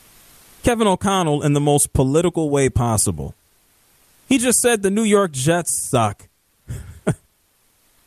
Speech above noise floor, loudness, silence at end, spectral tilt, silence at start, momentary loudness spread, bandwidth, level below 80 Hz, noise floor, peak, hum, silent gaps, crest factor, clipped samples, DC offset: 44 dB; -18 LUFS; 0.9 s; -4.5 dB/octave; 0.65 s; 15 LU; 14.5 kHz; -40 dBFS; -61 dBFS; -2 dBFS; none; none; 16 dB; under 0.1%; under 0.1%